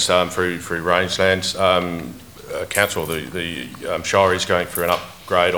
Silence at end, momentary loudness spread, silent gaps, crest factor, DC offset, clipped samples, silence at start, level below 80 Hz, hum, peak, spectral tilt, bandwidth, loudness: 0 s; 12 LU; none; 20 dB; 0.2%; under 0.1%; 0 s; -48 dBFS; none; 0 dBFS; -3.5 dB/octave; over 20 kHz; -20 LUFS